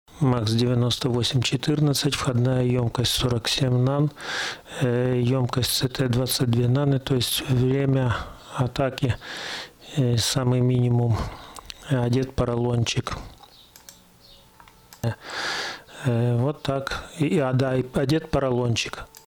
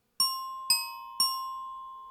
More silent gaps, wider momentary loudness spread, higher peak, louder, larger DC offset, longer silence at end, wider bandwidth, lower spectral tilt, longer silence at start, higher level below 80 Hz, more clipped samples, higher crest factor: neither; second, 9 LU vs 13 LU; about the same, -10 dBFS vs -12 dBFS; first, -24 LUFS vs -29 LUFS; neither; first, 0.2 s vs 0 s; about the same, 18.5 kHz vs 19.5 kHz; first, -5.5 dB/octave vs 3.5 dB/octave; about the same, 0.15 s vs 0.2 s; first, -44 dBFS vs -76 dBFS; neither; second, 14 dB vs 20 dB